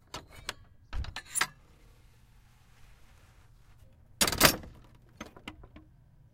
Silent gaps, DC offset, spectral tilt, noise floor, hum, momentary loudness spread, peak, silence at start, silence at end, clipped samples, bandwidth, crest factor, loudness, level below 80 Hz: none; under 0.1%; -2 dB/octave; -59 dBFS; none; 26 LU; -4 dBFS; 0.15 s; 0.55 s; under 0.1%; 16.5 kHz; 32 dB; -29 LUFS; -48 dBFS